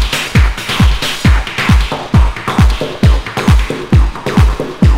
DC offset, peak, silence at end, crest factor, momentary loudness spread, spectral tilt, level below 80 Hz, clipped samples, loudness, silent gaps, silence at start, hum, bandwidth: under 0.1%; 0 dBFS; 0 s; 10 dB; 2 LU; -5.5 dB/octave; -14 dBFS; 0.5%; -12 LUFS; none; 0 s; none; 16 kHz